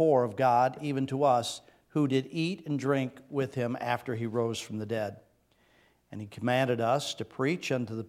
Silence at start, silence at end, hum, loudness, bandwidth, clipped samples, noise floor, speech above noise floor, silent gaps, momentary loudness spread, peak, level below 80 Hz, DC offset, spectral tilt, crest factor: 0 s; 0 s; none; -30 LUFS; 16 kHz; under 0.1%; -67 dBFS; 38 dB; none; 10 LU; -12 dBFS; -74 dBFS; under 0.1%; -6 dB/octave; 18 dB